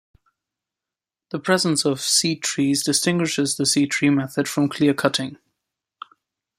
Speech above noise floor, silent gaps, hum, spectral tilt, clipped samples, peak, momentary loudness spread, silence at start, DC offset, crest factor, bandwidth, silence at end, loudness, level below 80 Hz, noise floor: 68 dB; none; none; -3.5 dB/octave; under 0.1%; -2 dBFS; 6 LU; 1.35 s; under 0.1%; 20 dB; 16 kHz; 1.25 s; -20 LUFS; -64 dBFS; -89 dBFS